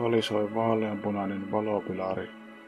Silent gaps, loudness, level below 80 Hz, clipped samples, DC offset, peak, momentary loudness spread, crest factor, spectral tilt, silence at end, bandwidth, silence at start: none; -29 LUFS; -66 dBFS; under 0.1%; under 0.1%; -12 dBFS; 6 LU; 18 dB; -6.5 dB/octave; 0 s; 12.5 kHz; 0 s